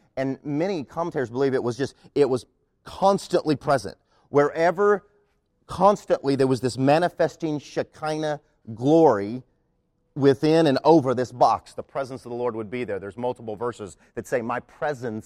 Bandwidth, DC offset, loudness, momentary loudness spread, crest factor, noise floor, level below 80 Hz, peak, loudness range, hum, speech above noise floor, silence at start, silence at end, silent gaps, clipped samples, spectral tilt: 13.5 kHz; under 0.1%; -23 LUFS; 13 LU; 20 dB; -69 dBFS; -58 dBFS; -4 dBFS; 6 LU; none; 47 dB; 0.15 s; 0.05 s; none; under 0.1%; -6.5 dB/octave